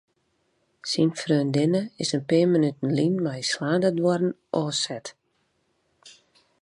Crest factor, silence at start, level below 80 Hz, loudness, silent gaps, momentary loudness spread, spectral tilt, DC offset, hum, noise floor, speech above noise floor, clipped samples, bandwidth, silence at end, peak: 16 dB; 0.85 s; -72 dBFS; -24 LUFS; none; 7 LU; -5.5 dB/octave; under 0.1%; none; -71 dBFS; 47 dB; under 0.1%; 11 kHz; 0.5 s; -8 dBFS